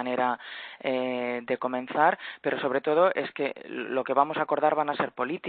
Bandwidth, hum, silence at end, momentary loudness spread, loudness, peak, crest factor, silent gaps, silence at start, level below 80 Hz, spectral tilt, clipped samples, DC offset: 4.6 kHz; none; 0 s; 8 LU; -27 LUFS; -6 dBFS; 20 dB; none; 0 s; -78 dBFS; -9 dB/octave; under 0.1%; under 0.1%